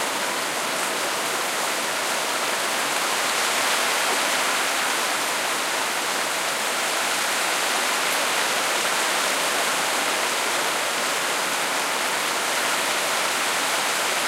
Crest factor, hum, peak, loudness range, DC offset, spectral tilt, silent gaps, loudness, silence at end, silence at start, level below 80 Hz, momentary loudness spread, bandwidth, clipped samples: 16 dB; none; -8 dBFS; 1 LU; under 0.1%; 0.5 dB/octave; none; -22 LUFS; 0 s; 0 s; -74 dBFS; 3 LU; 16 kHz; under 0.1%